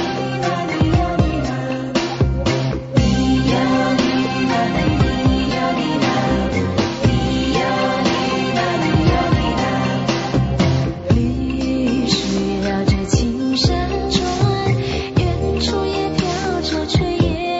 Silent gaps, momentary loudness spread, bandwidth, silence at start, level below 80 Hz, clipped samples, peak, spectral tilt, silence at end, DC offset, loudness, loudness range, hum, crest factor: none; 4 LU; 8 kHz; 0 s; -28 dBFS; under 0.1%; -2 dBFS; -5 dB/octave; 0 s; under 0.1%; -18 LUFS; 1 LU; none; 16 dB